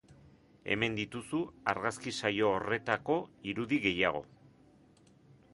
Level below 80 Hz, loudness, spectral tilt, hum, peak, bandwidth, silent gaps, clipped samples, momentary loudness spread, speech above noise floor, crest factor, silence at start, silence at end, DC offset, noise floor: -64 dBFS; -33 LUFS; -5 dB/octave; none; -12 dBFS; 11.5 kHz; none; under 0.1%; 8 LU; 29 dB; 24 dB; 0.1 s; 1.3 s; under 0.1%; -62 dBFS